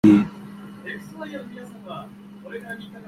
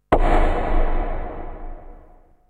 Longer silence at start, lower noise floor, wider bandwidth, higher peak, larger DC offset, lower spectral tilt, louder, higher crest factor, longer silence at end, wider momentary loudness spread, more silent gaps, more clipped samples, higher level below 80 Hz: about the same, 0.05 s vs 0.1 s; second, -39 dBFS vs -49 dBFS; first, 11.5 kHz vs 4.3 kHz; about the same, -2 dBFS vs -4 dBFS; neither; about the same, -8 dB/octave vs -7.5 dB/octave; second, -27 LUFS vs -23 LUFS; first, 22 dB vs 16 dB; second, 0.1 s vs 0.55 s; second, 17 LU vs 21 LU; neither; neither; second, -58 dBFS vs -22 dBFS